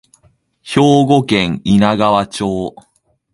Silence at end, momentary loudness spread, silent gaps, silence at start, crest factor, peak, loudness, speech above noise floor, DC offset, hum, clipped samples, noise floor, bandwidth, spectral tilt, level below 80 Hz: 0.65 s; 9 LU; none; 0.65 s; 14 dB; 0 dBFS; -13 LUFS; 42 dB; under 0.1%; none; under 0.1%; -55 dBFS; 11.5 kHz; -6 dB/octave; -44 dBFS